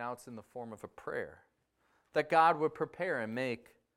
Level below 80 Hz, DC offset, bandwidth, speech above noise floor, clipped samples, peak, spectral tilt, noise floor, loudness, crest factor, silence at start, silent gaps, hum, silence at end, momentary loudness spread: -76 dBFS; under 0.1%; 14 kHz; 41 dB; under 0.1%; -14 dBFS; -5.5 dB/octave; -75 dBFS; -33 LUFS; 22 dB; 0 s; none; none; 0.4 s; 19 LU